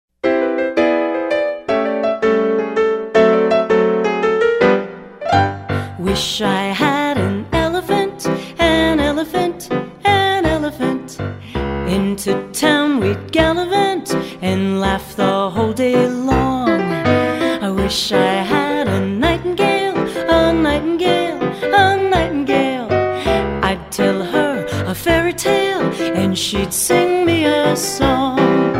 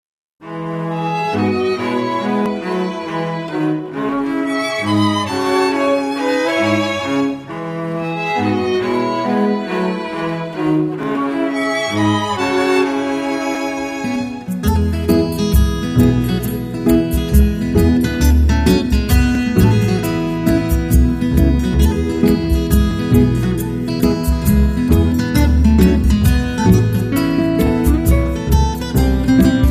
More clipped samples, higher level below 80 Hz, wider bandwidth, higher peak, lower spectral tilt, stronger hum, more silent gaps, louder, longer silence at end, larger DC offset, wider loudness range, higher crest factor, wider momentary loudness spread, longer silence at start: neither; second, -36 dBFS vs -22 dBFS; about the same, 16 kHz vs 15.5 kHz; about the same, 0 dBFS vs 0 dBFS; second, -5 dB/octave vs -6.5 dB/octave; neither; neither; about the same, -16 LUFS vs -16 LUFS; about the same, 0 s vs 0 s; neither; second, 2 LU vs 5 LU; about the same, 16 dB vs 14 dB; about the same, 6 LU vs 7 LU; second, 0.25 s vs 0.4 s